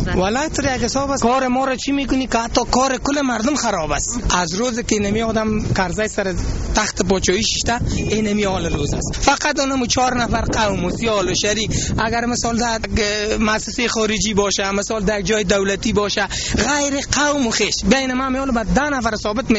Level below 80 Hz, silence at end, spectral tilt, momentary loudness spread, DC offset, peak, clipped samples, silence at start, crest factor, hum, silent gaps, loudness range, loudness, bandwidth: -30 dBFS; 0 s; -3.5 dB/octave; 3 LU; under 0.1%; -2 dBFS; under 0.1%; 0 s; 16 dB; none; none; 1 LU; -18 LUFS; 8.2 kHz